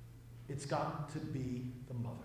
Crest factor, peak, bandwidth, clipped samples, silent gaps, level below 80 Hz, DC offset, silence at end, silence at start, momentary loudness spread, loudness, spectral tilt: 16 dB; -24 dBFS; 16 kHz; under 0.1%; none; -62 dBFS; under 0.1%; 0 s; 0 s; 10 LU; -42 LUFS; -6.5 dB/octave